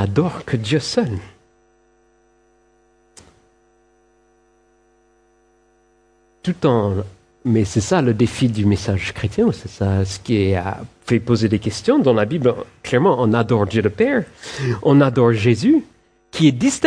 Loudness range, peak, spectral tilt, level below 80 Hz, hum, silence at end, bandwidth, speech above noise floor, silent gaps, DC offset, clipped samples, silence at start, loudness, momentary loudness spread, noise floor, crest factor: 9 LU; 0 dBFS; -6.5 dB/octave; -48 dBFS; none; 0 s; 10.5 kHz; 41 dB; none; under 0.1%; under 0.1%; 0 s; -18 LUFS; 10 LU; -58 dBFS; 18 dB